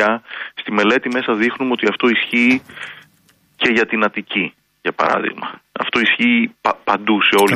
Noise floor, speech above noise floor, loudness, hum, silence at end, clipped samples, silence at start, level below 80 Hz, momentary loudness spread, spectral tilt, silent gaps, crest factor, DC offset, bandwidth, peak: -56 dBFS; 39 dB; -17 LUFS; none; 0 s; under 0.1%; 0 s; -60 dBFS; 12 LU; -4 dB/octave; none; 16 dB; under 0.1%; 14 kHz; -2 dBFS